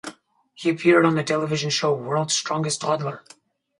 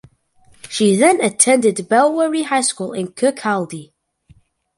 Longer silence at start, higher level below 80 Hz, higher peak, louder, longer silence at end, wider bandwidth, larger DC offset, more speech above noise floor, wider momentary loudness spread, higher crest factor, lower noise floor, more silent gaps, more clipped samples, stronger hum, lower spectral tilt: second, 0.05 s vs 0.65 s; second, -68 dBFS vs -62 dBFS; second, -4 dBFS vs 0 dBFS; second, -22 LUFS vs -16 LUFS; second, 0.6 s vs 0.95 s; second, 11.5 kHz vs 13 kHz; neither; second, 30 dB vs 36 dB; about the same, 10 LU vs 12 LU; about the same, 18 dB vs 18 dB; about the same, -52 dBFS vs -52 dBFS; neither; neither; neither; about the same, -4 dB/octave vs -3.5 dB/octave